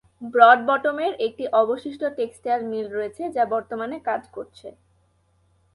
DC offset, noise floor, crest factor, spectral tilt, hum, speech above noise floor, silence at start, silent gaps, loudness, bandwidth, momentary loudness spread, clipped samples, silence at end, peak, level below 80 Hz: under 0.1%; -64 dBFS; 22 dB; -5 dB/octave; none; 42 dB; 0.2 s; none; -22 LUFS; 11.5 kHz; 15 LU; under 0.1%; 1.05 s; 0 dBFS; -66 dBFS